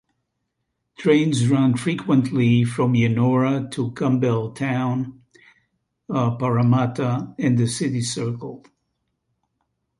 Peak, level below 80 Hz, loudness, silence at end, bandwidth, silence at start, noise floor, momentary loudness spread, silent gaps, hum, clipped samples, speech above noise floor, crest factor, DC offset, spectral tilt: -4 dBFS; -58 dBFS; -21 LUFS; 1.45 s; 11.5 kHz; 1 s; -76 dBFS; 9 LU; none; none; under 0.1%; 57 dB; 16 dB; under 0.1%; -6.5 dB/octave